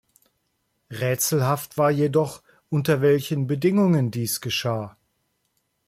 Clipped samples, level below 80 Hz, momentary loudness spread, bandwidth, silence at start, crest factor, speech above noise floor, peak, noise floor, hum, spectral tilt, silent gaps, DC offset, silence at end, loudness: under 0.1%; -62 dBFS; 9 LU; 16.5 kHz; 0.9 s; 16 dB; 51 dB; -8 dBFS; -73 dBFS; none; -5.5 dB/octave; none; under 0.1%; 0.95 s; -23 LUFS